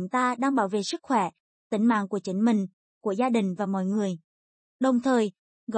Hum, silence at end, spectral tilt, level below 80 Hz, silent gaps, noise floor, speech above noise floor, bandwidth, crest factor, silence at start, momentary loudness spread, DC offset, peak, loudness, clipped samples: none; 0 s; -6 dB/octave; -76 dBFS; 1.40-1.70 s, 2.73-3.01 s, 4.24-4.79 s, 5.39-5.67 s; under -90 dBFS; over 65 dB; 8.8 kHz; 14 dB; 0 s; 9 LU; under 0.1%; -12 dBFS; -26 LUFS; under 0.1%